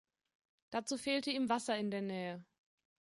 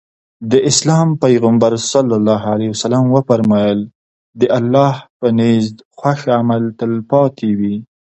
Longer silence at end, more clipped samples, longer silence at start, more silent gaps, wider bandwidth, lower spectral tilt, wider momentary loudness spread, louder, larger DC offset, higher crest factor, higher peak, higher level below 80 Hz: first, 0.75 s vs 0.35 s; neither; first, 0.7 s vs 0.4 s; second, none vs 3.95-4.33 s, 5.10-5.20 s, 5.85-5.91 s; first, 11.5 kHz vs 8.4 kHz; second, -4 dB/octave vs -6 dB/octave; about the same, 8 LU vs 8 LU; second, -38 LUFS vs -14 LUFS; neither; about the same, 18 dB vs 14 dB; second, -22 dBFS vs 0 dBFS; second, -80 dBFS vs -54 dBFS